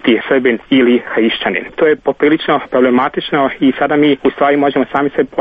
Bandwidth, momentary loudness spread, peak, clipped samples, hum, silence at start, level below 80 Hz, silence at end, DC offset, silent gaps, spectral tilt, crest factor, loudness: 4.9 kHz; 4 LU; 0 dBFS; under 0.1%; none; 0.05 s; -50 dBFS; 0 s; under 0.1%; none; -8 dB/octave; 12 dB; -13 LUFS